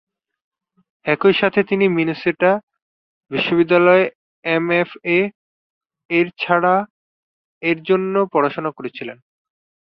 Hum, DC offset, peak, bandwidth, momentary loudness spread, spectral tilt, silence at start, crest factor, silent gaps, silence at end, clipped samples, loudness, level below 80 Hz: none; under 0.1%; -2 dBFS; 5.6 kHz; 12 LU; -8.5 dB/octave; 1.05 s; 18 dB; 2.63-2.67 s, 2.82-3.21 s, 4.15-4.43 s, 5.35-5.81 s, 6.05-6.09 s, 6.90-7.61 s; 0.75 s; under 0.1%; -18 LUFS; -62 dBFS